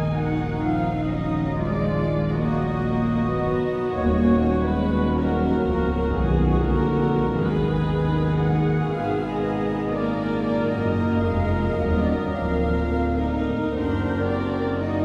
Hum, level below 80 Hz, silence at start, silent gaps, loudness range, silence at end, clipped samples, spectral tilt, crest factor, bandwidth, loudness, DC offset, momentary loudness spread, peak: none; -32 dBFS; 0 s; none; 2 LU; 0 s; under 0.1%; -9.5 dB/octave; 16 dB; 6.6 kHz; -23 LUFS; under 0.1%; 4 LU; -6 dBFS